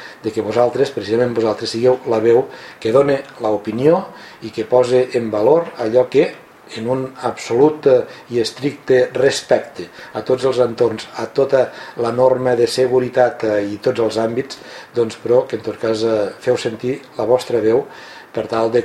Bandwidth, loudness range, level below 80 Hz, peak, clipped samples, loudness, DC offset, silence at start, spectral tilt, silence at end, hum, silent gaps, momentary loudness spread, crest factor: 13 kHz; 2 LU; -58 dBFS; 0 dBFS; under 0.1%; -17 LUFS; under 0.1%; 0 s; -5.5 dB/octave; 0 s; none; none; 11 LU; 16 dB